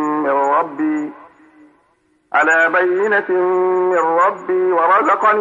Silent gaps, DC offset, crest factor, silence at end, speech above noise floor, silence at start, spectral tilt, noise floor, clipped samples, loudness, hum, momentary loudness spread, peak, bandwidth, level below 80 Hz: none; under 0.1%; 12 dB; 0 s; 45 dB; 0 s; -5 dB/octave; -60 dBFS; under 0.1%; -15 LUFS; none; 7 LU; -4 dBFS; 7.4 kHz; -72 dBFS